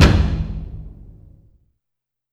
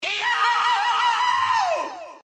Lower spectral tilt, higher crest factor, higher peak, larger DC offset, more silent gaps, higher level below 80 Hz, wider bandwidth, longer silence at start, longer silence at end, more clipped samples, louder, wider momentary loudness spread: first, -6 dB/octave vs 0 dB/octave; first, 20 dB vs 12 dB; first, 0 dBFS vs -10 dBFS; neither; neither; first, -24 dBFS vs -76 dBFS; first, 12.5 kHz vs 9.6 kHz; about the same, 0 s vs 0 s; first, 1.4 s vs 0.05 s; neither; about the same, -20 LUFS vs -20 LUFS; first, 24 LU vs 6 LU